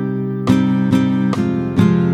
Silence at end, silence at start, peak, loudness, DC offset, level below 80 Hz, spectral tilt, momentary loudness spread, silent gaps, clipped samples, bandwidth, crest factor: 0 s; 0 s; 0 dBFS; -16 LUFS; under 0.1%; -46 dBFS; -8 dB/octave; 5 LU; none; under 0.1%; 11.5 kHz; 16 dB